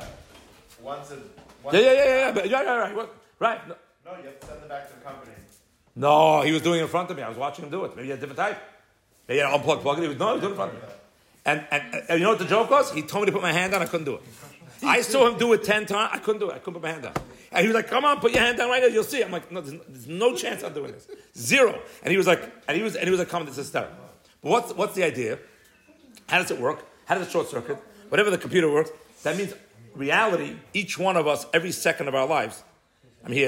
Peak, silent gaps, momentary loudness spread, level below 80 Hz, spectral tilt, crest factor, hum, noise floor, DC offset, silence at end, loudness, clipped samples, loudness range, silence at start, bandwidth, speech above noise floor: -6 dBFS; none; 18 LU; -62 dBFS; -4 dB/octave; 18 dB; none; -61 dBFS; under 0.1%; 0 s; -24 LUFS; under 0.1%; 4 LU; 0 s; 16.5 kHz; 37 dB